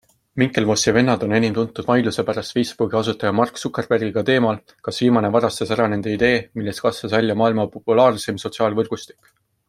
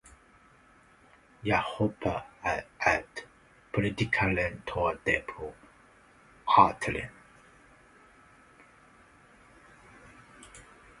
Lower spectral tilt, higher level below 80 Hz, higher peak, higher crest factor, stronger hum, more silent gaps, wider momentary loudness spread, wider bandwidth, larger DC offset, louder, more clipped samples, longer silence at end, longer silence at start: about the same, -5 dB/octave vs -5.5 dB/octave; about the same, -54 dBFS vs -54 dBFS; first, -2 dBFS vs -6 dBFS; second, 18 dB vs 26 dB; neither; neither; second, 8 LU vs 20 LU; first, 15.5 kHz vs 11.5 kHz; neither; first, -19 LUFS vs -29 LUFS; neither; first, 0.65 s vs 0.4 s; second, 0.35 s vs 1.45 s